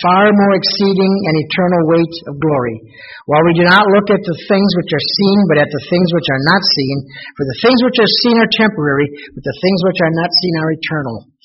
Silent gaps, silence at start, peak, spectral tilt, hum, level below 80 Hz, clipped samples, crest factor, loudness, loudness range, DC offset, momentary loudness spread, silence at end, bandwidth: none; 0 s; 0 dBFS; -4 dB/octave; none; -50 dBFS; under 0.1%; 12 dB; -12 LUFS; 2 LU; under 0.1%; 11 LU; 0.25 s; 6 kHz